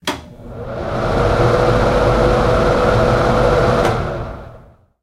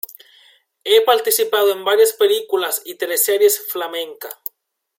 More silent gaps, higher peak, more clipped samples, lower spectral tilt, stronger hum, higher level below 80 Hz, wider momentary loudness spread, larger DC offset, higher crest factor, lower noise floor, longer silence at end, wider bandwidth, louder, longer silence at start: neither; about the same, 0 dBFS vs 0 dBFS; neither; first, -6.5 dB/octave vs 0.5 dB/octave; neither; first, -26 dBFS vs -76 dBFS; about the same, 15 LU vs 16 LU; neither; about the same, 14 dB vs 18 dB; second, -43 dBFS vs -67 dBFS; second, 0.45 s vs 0.65 s; second, 14.5 kHz vs 17 kHz; about the same, -15 LUFS vs -16 LUFS; second, 0.05 s vs 0.85 s